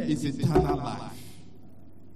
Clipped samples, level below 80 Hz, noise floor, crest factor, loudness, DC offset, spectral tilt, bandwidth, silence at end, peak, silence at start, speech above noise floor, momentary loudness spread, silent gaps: under 0.1%; -42 dBFS; -52 dBFS; 18 dB; -27 LUFS; 0.8%; -7 dB/octave; 13.5 kHz; 0.55 s; -10 dBFS; 0 s; 25 dB; 21 LU; none